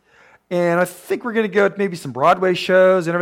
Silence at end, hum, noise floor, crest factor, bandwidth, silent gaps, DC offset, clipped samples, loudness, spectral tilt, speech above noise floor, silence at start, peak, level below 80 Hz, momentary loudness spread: 0 s; none; -52 dBFS; 14 dB; 16 kHz; none; under 0.1%; under 0.1%; -18 LUFS; -5.5 dB/octave; 35 dB; 0.5 s; -4 dBFS; -66 dBFS; 10 LU